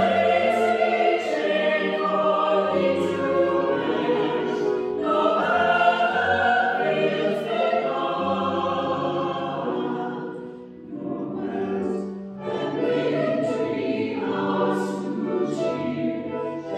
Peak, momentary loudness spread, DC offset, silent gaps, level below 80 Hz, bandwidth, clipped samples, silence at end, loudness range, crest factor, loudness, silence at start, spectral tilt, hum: -8 dBFS; 10 LU; under 0.1%; none; -68 dBFS; 12 kHz; under 0.1%; 0 s; 7 LU; 16 dB; -23 LUFS; 0 s; -6 dB/octave; none